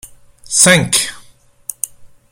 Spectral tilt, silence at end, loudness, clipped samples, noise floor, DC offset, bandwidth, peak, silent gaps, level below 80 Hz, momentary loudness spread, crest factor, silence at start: -2 dB/octave; 0.25 s; -12 LUFS; under 0.1%; -45 dBFS; under 0.1%; over 20 kHz; 0 dBFS; none; -48 dBFS; 19 LU; 18 dB; 0.45 s